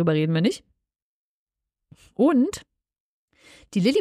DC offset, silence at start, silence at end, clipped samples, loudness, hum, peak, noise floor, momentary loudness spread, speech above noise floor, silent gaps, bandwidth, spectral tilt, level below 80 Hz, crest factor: under 0.1%; 0 s; 0 s; under 0.1%; -22 LUFS; none; -8 dBFS; -78 dBFS; 18 LU; 56 dB; 1.02-1.47 s, 3.00-3.28 s; 13.5 kHz; -6.5 dB/octave; -62 dBFS; 18 dB